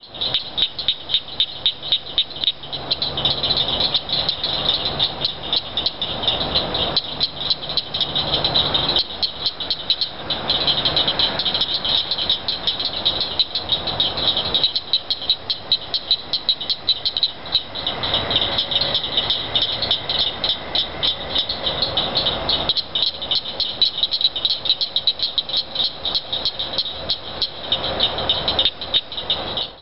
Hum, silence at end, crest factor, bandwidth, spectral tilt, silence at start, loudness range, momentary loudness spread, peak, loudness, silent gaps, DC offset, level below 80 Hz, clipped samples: none; 0 s; 18 dB; 8 kHz; -5 dB/octave; 0 s; 2 LU; 5 LU; -4 dBFS; -19 LUFS; none; 1%; -44 dBFS; under 0.1%